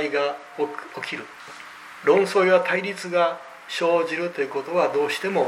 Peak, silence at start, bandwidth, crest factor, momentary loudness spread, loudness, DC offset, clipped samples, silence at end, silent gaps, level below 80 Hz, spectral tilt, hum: -6 dBFS; 0 s; 15 kHz; 18 dB; 18 LU; -23 LUFS; under 0.1%; under 0.1%; 0 s; none; -76 dBFS; -4.5 dB/octave; none